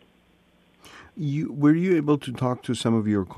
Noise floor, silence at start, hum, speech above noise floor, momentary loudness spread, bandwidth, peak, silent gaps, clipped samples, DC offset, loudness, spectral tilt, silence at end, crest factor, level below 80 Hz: -60 dBFS; 0.85 s; none; 38 dB; 9 LU; 12 kHz; -8 dBFS; none; under 0.1%; under 0.1%; -24 LUFS; -7 dB/octave; 0 s; 16 dB; -62 dBFS